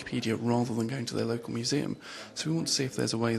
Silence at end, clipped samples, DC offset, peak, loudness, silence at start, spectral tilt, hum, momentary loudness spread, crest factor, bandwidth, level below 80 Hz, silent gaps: 0 s; under 0.1%; under 0.1%; -14 dBFS; -31 LUFS; 0 s; -4.5 dB/octave; none; 7 LU; 18 dB; 13 kHz; -66 dBFS; none